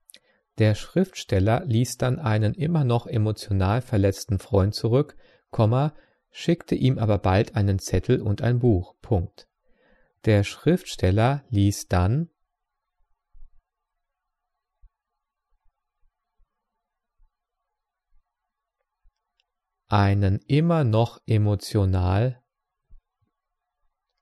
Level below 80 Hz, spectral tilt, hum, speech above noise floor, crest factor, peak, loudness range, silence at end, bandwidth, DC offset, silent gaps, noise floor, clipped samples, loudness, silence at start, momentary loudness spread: -48 dBFS; -7 dB/octave; none; 61 dB; 18 dB; -8 dBFS; 4 LU; 1.25 s; 13 kHz; under 0.1%; none; -83 dBFS; under 0.1%; -23 LUFS; 0.55 s; 6 LU